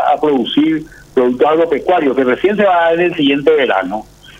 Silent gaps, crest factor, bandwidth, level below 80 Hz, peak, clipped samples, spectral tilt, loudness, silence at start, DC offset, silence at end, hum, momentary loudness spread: none; 12 dB; 9.2 kHz; -48 dBFS; 0 dBFS; under 0.1%; -6.5 dB/octave; -13 LUFS; 0 s; under 0.1%; 0.4 s; none; 6 LU